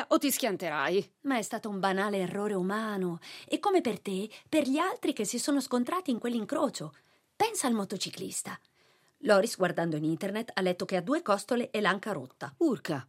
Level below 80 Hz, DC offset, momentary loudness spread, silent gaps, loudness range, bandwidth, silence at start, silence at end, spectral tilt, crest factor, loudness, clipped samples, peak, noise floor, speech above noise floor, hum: -84 dBFS; under 0.1%; 8 LU; none; 2 LU; 16 kHz; 0 s; 0.05 s; -4.5 dB/octave; 20 dB; -30 LUFS; under 0.1%; -10 dBFS; -67 dBFS; 36 dB; none